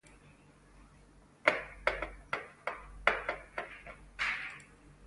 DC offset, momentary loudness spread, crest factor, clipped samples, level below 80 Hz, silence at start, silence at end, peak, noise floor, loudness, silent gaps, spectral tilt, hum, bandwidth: under 0.1%; 15 LU; 32 dB; under 0.1%; -56 dBFS; 0.05 s; 0 s; -6 dBFS; -60 dBFS; -36 LUFS; none; -3.5 dB/octave; none; 11.5 kHz